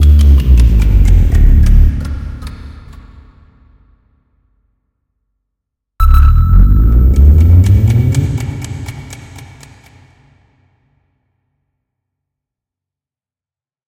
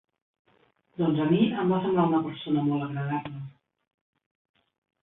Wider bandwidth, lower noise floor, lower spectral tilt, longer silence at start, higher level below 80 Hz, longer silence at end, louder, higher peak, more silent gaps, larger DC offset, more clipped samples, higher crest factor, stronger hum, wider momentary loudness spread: first, 15.5 kHz vs 4 kHz; first, under -90 dBFS vs -66 dBFS; second, -7.5 dB/octave vs -11.5 dB/octave; second, 0 s vs 1 s; first, -12 dBFS vs -66 dBFS; first, 4.45 s vs 1.5 s; first, -10 LUFS vs -26 LUFS; first, 0 dBFS vs -10 dBFS; neither; neither; first, 0.4% vs under 0.1%; second, 12 dB vs 18 dB; neither; first, 20 LU vs 16 LU